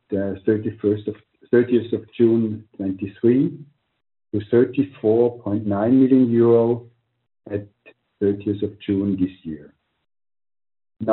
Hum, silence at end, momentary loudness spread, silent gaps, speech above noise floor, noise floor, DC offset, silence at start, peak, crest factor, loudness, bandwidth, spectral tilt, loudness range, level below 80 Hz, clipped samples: none; 0 s; 14 LU; none; over 70 dB; under -90 dBFS; under 0.1%; 0.1 s; -4 dBFS; 18 dB; -21 LUFS; 4.1 kHz; -8.5 dB/octave; 8 LU; -62 dBFS; under 0.1%